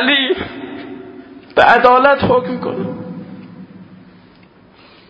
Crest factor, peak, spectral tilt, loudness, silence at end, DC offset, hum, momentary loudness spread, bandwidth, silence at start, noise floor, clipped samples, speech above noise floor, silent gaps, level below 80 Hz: 16 dB; 0 dBFS; -6.5 dB/octave; -13 LUFS; 1.15 s; under 0.1%; none; 24 LU; 8 kHz; 0 s; -46 dBFS; under 0.1%; 34 dB; none; -48 dBFS